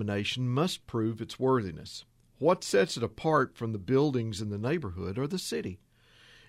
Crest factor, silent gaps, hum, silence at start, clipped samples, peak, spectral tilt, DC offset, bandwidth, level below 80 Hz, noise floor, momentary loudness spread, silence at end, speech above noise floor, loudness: 18 dB; none; none; 0 s; under 0.1%; -12 dBFS; -5.5 dB/octave; under 0.1%; 15 kHz; -60 dBFS; -59 dBFS; 10 LU; 0.75 s; 29 dB; -30 LUFS